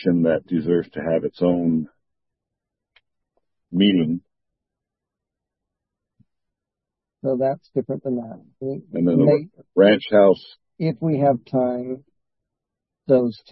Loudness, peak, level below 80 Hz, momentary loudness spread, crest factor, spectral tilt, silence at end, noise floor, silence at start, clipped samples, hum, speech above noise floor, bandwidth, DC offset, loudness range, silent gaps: -21 LUFS; -2 dBFS; -64 dBFS; 14 LU; 20 dB; -11 dB/octave; 0.2 s; -86 dBFS; 0 s; under 0.1%; none; 66 dB; 5.6 kHz; under 0.1%; 10 LU; none